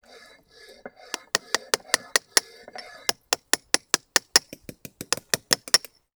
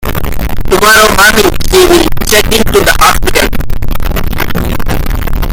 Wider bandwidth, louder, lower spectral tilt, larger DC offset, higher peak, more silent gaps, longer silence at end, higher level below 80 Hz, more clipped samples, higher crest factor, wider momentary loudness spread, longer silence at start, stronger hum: about the same, over 20 kHz vs over 20 kHz; second, -23 LUFS vs -8 LUFS; second, 0.5 dB/octave vs -3.5 dB/octave; neither; about the same, 0 dBFS vs 0 dBFS; neither; first, 0.4 s vs 0 s; second, -68 dBFS vs -14 dBFS; second, under 0.1% vs 3%; first, 28 dB vs 6 dB; first, 21 LU vs 12 LU; first, 1.35 s vs 0 s; neither